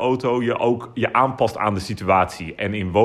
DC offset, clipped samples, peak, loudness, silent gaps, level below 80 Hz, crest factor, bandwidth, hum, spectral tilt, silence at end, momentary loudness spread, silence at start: under 0.1%; under 0.1%; -4 dBFS; -21 LUFS; none; -52 dBFS; 16 dB; 13.5 kHz; none; -6.5 dB/octave; 0 s; 6 LU; 0 s